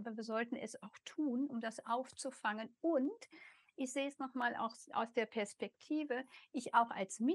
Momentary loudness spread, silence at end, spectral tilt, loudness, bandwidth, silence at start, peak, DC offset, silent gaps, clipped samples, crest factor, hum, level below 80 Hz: 12 LU; 0 s; -4 dB/octave; -40 LUFS; 12 kHz; 0 s; -18 dBFS; under 0.1%; none; under 0.1%; 22 dB; none; under -90 dBFS